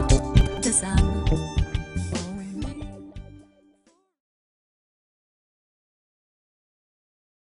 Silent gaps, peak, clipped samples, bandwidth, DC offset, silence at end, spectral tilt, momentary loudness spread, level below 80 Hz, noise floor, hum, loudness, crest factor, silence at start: none; -4 dBFS; under 0.1%; 11 kHz; under 0.1%; 4.15 s; -5 dB/octave; 19 LU; -30 dBFS; -63 dBFS; none; -25 LUFS; 22 dB; 0 s